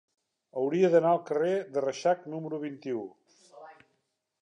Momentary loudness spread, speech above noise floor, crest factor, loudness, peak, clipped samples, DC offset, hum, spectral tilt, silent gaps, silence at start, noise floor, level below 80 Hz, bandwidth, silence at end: 13 LU; 50 dB; 20 dB; -29 LUFS; -10 dBFS; under 0.1%; under 0.1%; none; -6.5 dB/octave; none; 0.55 s; -78 dBFS; -86 dBFS; 10 kHz; 0.7 s